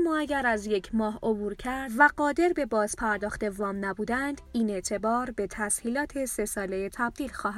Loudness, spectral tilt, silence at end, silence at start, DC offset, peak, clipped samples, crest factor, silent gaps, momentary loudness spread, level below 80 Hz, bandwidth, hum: -28 LUFS; -4 dB/octave; 0 s; 0 s; under 0.1%; -6 dBFS; under 0.1%; 22 dB; none; 8 LU; -50 dBFS; 15.5 kHz; none